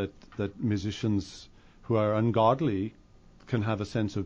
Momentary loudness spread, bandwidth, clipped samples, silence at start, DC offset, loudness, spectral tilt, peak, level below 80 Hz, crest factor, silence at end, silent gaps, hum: 12 LU; 8 kHz; under 0.1%; 0 s; under 0.1%; -29 LUFS; -7.5 dB/octave; -10 dBFS; -56 dBFS; 18 dB; 0 s; none; none